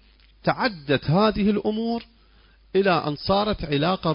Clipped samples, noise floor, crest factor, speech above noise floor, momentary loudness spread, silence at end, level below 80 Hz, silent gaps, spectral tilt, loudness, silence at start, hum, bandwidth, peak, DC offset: under 0.1%; -55 dBFS; 16 dB; 33 dB; 7 LU; 0 s; -46 dBFS; none; -10.5 dB/octave; -23 LUFS; 0.45 s; none; 5.4 kHz; -6 dBFS; under 0.1%